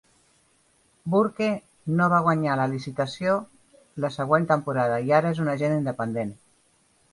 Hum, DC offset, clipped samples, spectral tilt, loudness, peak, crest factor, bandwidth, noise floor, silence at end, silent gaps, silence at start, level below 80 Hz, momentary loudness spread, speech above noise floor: none; under 0.1%; under 0.1%; -7.5 dB/octave; -24 LUFS; -6 dBFS; 20 dB; 11.5 kHz; -64 dBFS; 0.8 s; none; 1.05 s; -64 dBFS; 10 LU; 40 dB